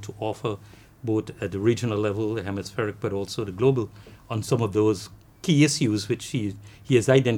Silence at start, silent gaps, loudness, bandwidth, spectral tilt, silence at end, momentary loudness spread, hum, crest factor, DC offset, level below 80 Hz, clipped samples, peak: 0 s; none; -25 LUFS; 16.5 kHz; -6 dB/octave; 0 s; 13 LU; none; 20 dB; under 0.1%; -56 dBFS; under 0.1%; -6 dBFS